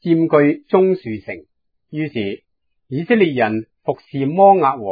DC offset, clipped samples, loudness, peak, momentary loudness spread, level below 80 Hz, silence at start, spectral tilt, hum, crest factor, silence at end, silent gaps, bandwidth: under 0.1%; under 0.1%; -17 LUFS; 0 dBFS; 17 LU; -62 dBFS; 0.05 s; -10.5 dB/octave; none; 16 dB; 0 s; none; 5 kHz